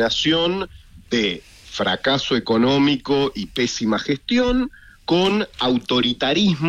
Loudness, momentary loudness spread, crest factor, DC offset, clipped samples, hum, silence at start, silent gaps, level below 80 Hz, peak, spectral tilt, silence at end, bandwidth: -20 LUFS; 7 LU; 12 dB; under 0.1%; under 0.1%; none; 0 s; none; -44 dBFS; -8 dBFS; -5 dB/octave; 0 s; 11 kHz